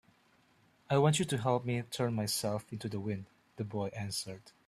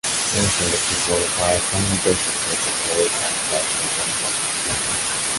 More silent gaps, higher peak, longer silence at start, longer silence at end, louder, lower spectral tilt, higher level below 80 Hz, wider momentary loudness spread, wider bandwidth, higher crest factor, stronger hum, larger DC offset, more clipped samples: neither; second, -14 dBFS vs -4 dBFS; first, 0.9 s vs 0.05 s; first, 0.2 s vs 0 s; second, -34 LUFS vs -18 LUFS; first, -5 dB/octave vs -2 dB/octave; second, -68 dBFS vs -42 dBFS; first, 12 LU vs 2 LU; first, 15 kHz vs 12 kHz; about the same, 20 dB vs 18 dB; neither; neither; neither